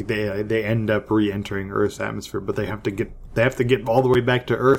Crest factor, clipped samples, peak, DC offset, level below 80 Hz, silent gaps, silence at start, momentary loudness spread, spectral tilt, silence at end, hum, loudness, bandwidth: 16 dB; under 0.1%; -4 dBFS; under 0.1%; -44 dBFS; none; 0 s; 9 LU; -7 dB/octave; 0 s; none; -22 LUFS; 16.5 kHz